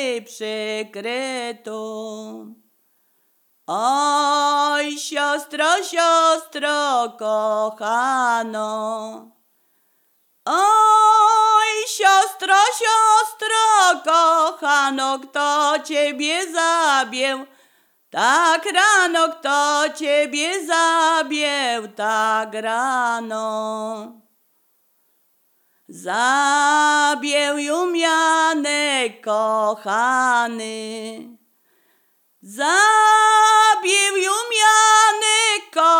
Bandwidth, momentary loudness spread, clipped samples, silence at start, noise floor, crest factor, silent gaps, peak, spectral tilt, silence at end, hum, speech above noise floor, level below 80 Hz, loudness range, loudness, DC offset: 19 kHz; 14 LU; under 0.1%; 0 s; -63 dBFS; 16 dB; none; -2 dBFS; -0.5 dB/octave; 0 s; none; 45 dB; -90 dBFS; 9 LU; -17 LUFS; under 0.1%